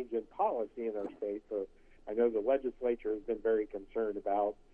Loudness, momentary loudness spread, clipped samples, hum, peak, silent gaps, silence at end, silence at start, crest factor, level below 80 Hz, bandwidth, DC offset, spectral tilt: -35 LUFS; 8 LU; under 0.1%; none; -18 dBFS; none; 0.2 s; 0 s; 16 dB; -64 dBFS; 3.5 kHz; under 0.1%; -8 dB/octave